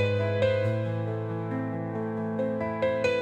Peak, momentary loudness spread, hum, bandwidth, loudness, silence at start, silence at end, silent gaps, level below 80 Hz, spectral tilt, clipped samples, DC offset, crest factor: -12 dBFS; 6 LU; none; 8.2 kHz; -29 LUFS; 0 s; 0 s; none; -64 dBFS; -7.5 dB/octave; under 0.1%; under 0.1%; 16 dB